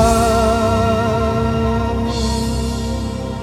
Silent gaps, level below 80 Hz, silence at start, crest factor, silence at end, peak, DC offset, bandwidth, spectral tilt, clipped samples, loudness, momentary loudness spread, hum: none; -24 dBFS; 0 s; 14 dB; 0 s; -2 dBFS; under 0.1%; 17.5 kHz; -6 dB/octave; under 0.1%; -17 LUFS; 8 LU; none